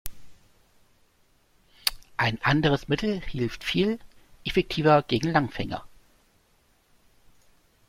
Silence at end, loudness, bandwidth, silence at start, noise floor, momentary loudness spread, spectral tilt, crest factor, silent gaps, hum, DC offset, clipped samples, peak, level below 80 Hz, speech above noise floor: 2 s; -26 LUFS; 16.5 kHz; 0.05 s; -64 dBFS; 13 LU; -5.5 dB/octave; 22 dB; none; none; under 0.1%; under 0.1%; -6 dBFS; -48 dBFS; 40 dB